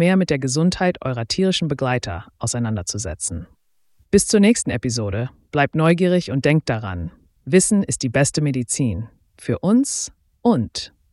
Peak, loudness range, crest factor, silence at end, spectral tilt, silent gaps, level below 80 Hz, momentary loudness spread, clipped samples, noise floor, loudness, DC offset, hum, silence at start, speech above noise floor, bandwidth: -2 dBFS; 3 LU; 18 dB; 0.25 s; -5 dB/octave; none; -44 dBFS; 13 LU; under 0.1%; -60 dBFS; -20 LUFS; under 0.1%; none; 0 s; 41 dB; 12 kHz